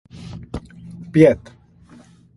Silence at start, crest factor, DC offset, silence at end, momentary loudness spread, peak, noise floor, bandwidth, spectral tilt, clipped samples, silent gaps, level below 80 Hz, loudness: 0.2 s; 22 dB; under 0.1%; 1 s; 24 LU; 0 dBFS; -47 dBFS; 11.5 kHz; -8.5 dB/octave; under 0.1%; none; -46 dBFS; -16 LUFS